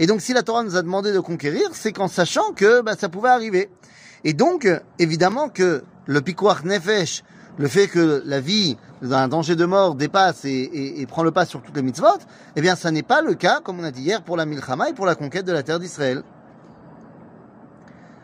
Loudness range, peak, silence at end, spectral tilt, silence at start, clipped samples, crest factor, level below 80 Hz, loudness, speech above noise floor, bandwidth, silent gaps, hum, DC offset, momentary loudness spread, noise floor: 5 LU; -4 dBFS; 0.95 s; -5 dB/octave; 0 s; under 0.1%; 18 dB; -66 dBFS; -20 LUFS; 26 dB; 15.5 kHz; none; none; under 0.1%; 9 LU; -46 dBFS